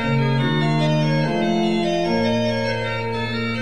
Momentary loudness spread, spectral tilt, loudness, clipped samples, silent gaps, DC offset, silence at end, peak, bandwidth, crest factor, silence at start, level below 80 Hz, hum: 5 LU; -6.5 dB/octave; -20 LUFS; under 0.1%; none; 1%; 0 s; -8 dBFS; 11 kHz; 12 dB; 0 s; -46 dBFS; none